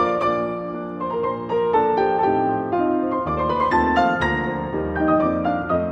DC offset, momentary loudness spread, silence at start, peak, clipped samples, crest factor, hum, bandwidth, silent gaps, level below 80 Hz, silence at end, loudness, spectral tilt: under 0.1%; 7 LU; 0 s; -6 dBFS; under 0.1%; 14 dB; none; 8.2 kHz; none; -42 dBFS; 0 s; -21 LUFS; -7.5 dB/octave